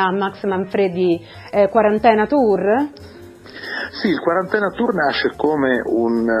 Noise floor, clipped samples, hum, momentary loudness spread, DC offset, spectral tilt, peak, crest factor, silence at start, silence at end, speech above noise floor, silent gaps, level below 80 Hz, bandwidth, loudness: -37 dBFS; under 0.1%; none; 10 LU; under 0.1%; -7 dB/octave; 0 dBFS; 18 dB; 0 s; 0 s; 20 dB; none; -50 dBFS; 11.5 kHz; -18 LUFS